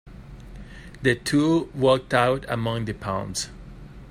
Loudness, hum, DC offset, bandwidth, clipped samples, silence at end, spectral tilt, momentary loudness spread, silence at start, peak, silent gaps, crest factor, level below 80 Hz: -23 LUFS; none; under 0.1%; 15.5 kHz; under 0.1%; 0 s; -5 dB/octave; 23 LU; 0.05 s; -4 dBFS; none; 20 dB; -46 dBFS